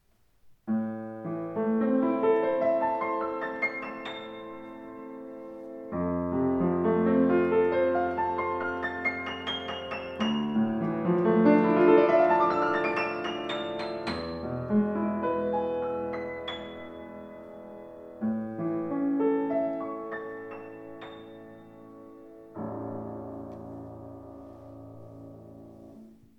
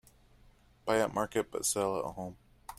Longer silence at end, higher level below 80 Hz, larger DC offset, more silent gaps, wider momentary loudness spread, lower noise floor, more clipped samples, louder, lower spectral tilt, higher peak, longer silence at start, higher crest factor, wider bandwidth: first, 0.3 s vs 0.05 s; about the same, -62 dBFS vs -62 dBFS; neither; neither; first, 22 LU vs 14 LU; about the same, -61 dBFS vs -62 dBFS; neither; first, -28 LUFS vs -33 LUFS; first, -7.5 dB/octave vs -3.5 dB/octave; first, -8 dBFS vs -14 dBFS; second, 0.45 s vs 0.85 s; about the same, 20 dB vs 20 dB; second, 7.4 kHz vs 16 kHz